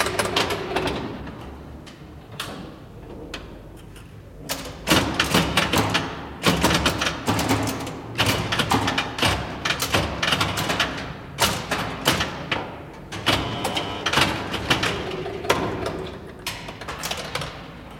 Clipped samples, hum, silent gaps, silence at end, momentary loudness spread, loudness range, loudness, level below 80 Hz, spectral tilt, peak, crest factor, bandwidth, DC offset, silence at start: under 0.1%; none; none; 0 s; 19 LU; 9 LU; -23 LUFS; -42 dBFS; -3.5 dB/octave; -2 dBFS; 22 dB; 17 kHz; under 0.1%; 0 s